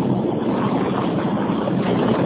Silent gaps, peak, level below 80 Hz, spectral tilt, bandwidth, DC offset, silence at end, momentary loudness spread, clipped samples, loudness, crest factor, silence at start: none; -8 dBFS; -48 dBFS; -12 dB/octave; 4 kHz; under 0.1%; 0 s; 2 LU; under 0.1%; -21 LUFS; 12 dB; 0 s